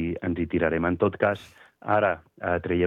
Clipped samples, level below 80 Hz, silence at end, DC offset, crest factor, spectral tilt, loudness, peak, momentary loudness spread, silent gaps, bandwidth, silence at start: under 0.1%; -54 dBFS; 0 s; under 0.1%; 18 dB; -8.5 dB/octave; -26 LUFS; -8 dBFS; 7 LU; none; 9 kHz; 0 s